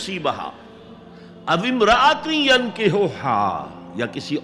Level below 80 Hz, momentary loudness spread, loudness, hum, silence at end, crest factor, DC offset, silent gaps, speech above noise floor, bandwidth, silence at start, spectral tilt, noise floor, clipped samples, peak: -50 dBFS; 15 LU; -19 LUFS; none; 0 s; 16 dB; under 0.1%; none; 22 dB; 12 kHz; 0 s; -4.5 dB/octave; -42 dBFS; under 0.1%; -4 dBFS